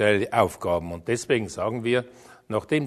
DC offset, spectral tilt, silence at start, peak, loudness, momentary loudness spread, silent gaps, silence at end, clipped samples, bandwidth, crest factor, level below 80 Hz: under 0.1%; -5.5 dB/octave; 0 s; -4 dBFS; -25 LUFS; 8 LU; none; 0 s; under 0.1%; 13.5 kHz; 20 dB; -54 dBFS